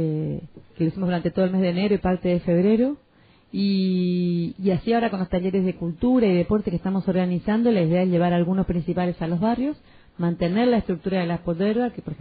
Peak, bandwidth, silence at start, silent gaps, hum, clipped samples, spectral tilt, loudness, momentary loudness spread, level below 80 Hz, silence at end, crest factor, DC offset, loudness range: -8 dBFS; 4.8 kHz; 0 s; none; none; under 0.1%; -7 dB/octave; -23 LUFS; 6 LU; -46 dBFS; 0.05 s; 14 dB; under 0.1%; 2 LU